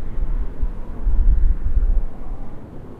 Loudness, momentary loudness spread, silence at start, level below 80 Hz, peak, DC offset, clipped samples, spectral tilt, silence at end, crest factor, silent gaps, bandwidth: -25 LUFS; 15 LU; 0 s; -18 dBFS; -4 dBFS; under 0.1%; under 0.1%; -10 dB/octave; 0 s; 12 dB; none; 2.2 kHz